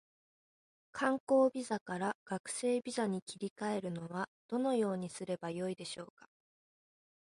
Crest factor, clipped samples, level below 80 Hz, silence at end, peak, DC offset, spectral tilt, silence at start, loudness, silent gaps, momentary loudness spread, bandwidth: 18 dB; under 0.1%; -80 dBFS; 1.15 s; -18 dBFS; under 0.1%; -5 dB/octave; 0.95 s; -37 LUFS; 1.20-1.27 s, 1.81-1.86 s, 2.15-2.26 s, 2.40-2.44 s, 3.22-3.27 s, 3.50-3.56 s, 4.28-4.49 s; 12 LU; 11.5 kHz